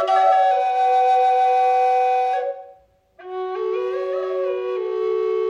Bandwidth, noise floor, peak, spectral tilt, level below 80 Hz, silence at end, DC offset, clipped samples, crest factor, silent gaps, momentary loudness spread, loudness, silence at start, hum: 9.2 kHz; -51 dBFS; -6 dBFS; -3 dB/octave; -72 dBFS; 0 s; under 0.1%; under 0.1%; 14 dB; none; 11 LU; -19 LUFS; 0 s; none